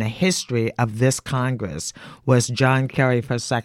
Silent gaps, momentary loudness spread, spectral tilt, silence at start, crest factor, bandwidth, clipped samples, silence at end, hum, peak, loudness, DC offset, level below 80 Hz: none; 9 LU; -5 dB/octave; 0 s; 18 dB; 14 kHz; under 0.1%; 0 s; none; -4 dBFS; -21 LUFS; under 0.1%; -52 dBFS